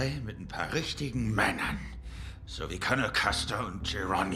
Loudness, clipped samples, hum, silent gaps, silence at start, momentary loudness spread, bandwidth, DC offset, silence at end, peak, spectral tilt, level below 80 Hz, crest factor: -31 LUFS; under 0.1%; none; none; 0 s; 15 LU; 15.5 kHz; under 0.1%; 0 s; -10 dBFS; -4.5 dB/octave; -44 dBFS; 22 dB